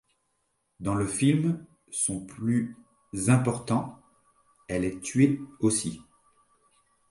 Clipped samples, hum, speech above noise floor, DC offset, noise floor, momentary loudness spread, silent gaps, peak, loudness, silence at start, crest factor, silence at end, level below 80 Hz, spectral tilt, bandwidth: under 0.1%; none; 49 dB; under 0.1%; -75 dBFS; 12 LU; none; -8 dBFS; -27 LUFS; 0.8 s; 20 dB; 1.1 s; -56 dBFS; -5.5 dB/octave; 11.5 kHz